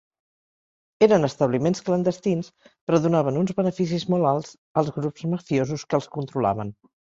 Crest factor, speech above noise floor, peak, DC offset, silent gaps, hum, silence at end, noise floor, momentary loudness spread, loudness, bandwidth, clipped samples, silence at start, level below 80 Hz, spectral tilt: 20 dB; over 67 dB; -4 dBFS; under 0.1%; 2.81-2.87 s, 4.58-4.75 s; none; 0.4 s; under -90 dBFS; 9 LU; -23 LUFS; 7.8 kHz; under 0.1%; 1 s; -60 dBFS; -7 dB/octave